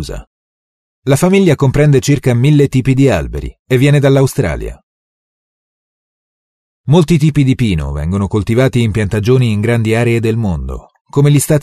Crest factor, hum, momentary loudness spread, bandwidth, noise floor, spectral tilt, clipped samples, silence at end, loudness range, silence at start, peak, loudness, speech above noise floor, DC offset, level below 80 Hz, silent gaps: 12 dB; none; 14 LU; 13.5 kHz; under -90 dBFS; -7 dB/octave; under 0.1%; 0 s; 5 LU; 0 s; 0 dBFS; -12 LUFS; over 79 dB; under 0.1%; -30 dBFS; 0.27-1.02 s, 3.59-3.65 s, 4.83-6.84 s, 11.01-11.05 s